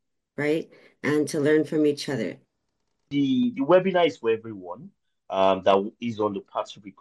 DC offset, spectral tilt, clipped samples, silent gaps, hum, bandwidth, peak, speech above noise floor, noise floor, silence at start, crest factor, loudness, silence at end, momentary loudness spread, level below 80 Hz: under 0.1%; -6 dB/octave; under 0.1%; none; none; 12.5 kHz; -6 dBFS; 54 dB; -78 dBFS; 0.4 s; 18 dB; -24 LUFS; 0.1 s; 17 LU; -72 dBFS